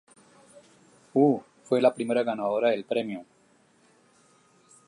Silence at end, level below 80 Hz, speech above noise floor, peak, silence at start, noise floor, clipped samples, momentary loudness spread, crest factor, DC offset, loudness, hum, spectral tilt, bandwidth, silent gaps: 1.65 s; -80 dBFS; 38 dB; -8 dBFS; 1.15 s; -63 dBFS; under 0.1%; 8 LU; 20 dB; under 0.1%; -26 LUFS; none; -6.5 dB/octave; 11 kHz; none